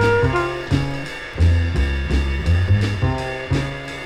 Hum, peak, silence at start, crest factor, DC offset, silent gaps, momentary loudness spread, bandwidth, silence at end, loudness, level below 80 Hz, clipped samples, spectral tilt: none; -4 dBFS; 0 s; 14 dB; under 0.1%; none; 8 LU; 10.5 kHz; 0 s; -20 LUFS; -26 dBFS; under 0.1%; -7 dB/octave